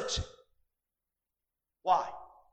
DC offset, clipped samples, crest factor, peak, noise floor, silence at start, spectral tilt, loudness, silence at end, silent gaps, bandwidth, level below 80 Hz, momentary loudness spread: under 0.1%; under 0.1%; 24 dB; -14 dBFS; -90 dBFS; 0 s; -3 dB/octave; -33 LUFS; 0.25 s; none; 9 kHz; -54 dBFS; 18 LU